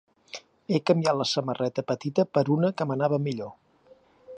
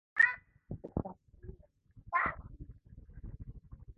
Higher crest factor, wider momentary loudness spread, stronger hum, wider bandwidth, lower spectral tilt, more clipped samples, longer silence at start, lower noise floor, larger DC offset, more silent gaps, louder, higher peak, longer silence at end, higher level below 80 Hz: about the same, 20 dB vs 24 dB; second, 18 LU vs 26 LU; neither; first, 10 kHz vs 6.4 kHz; first, -6 dB/octave vs -4.5 dB/octave; neither; first, 0.35 s vs 0.15 s; about the same, -58 dBFS vs -61 dBFS; neither; neither; first, -26 LUFS vs -33 LUFS; first, -8 dBFS vs -14 dBFS; about the same, 0 s vs 0.05 s; second, -72 dBFS vs -54 dBFS